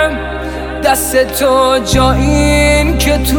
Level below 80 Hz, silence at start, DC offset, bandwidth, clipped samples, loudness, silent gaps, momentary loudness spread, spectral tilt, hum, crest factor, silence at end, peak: -18 dBFS; 0 s; under 0.1%; 19 kHz; under 0.1%; -11 LUFS; none; 10 LU; -4.5 dB/octave; none; 10 dB; 0 s; 0 dBFS